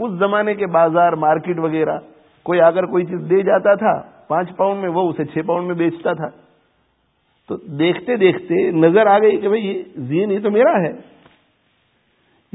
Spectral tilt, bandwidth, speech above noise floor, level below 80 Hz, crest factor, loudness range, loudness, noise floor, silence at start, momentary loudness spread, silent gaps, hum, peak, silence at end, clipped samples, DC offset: -12 dB/octave; 4 kHz; 47 dB; -64 dBFS; 18 dB; 6 LU; -17 LUFS; -63 dBFS; 0 s; 11 LU; none; none; 0 dBFS; 1.55 s; under 0.1%; under 0.1%